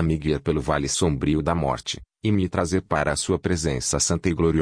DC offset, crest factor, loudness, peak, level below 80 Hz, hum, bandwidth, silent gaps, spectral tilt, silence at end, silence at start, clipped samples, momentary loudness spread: under 0.1%; 16 dB; -23 LUFS; -6 dBFS; -38 dBFS; none; 10.5 kHz; none; -5 dB/octave; 0 s; 0 s; under 0.1%; 3 LU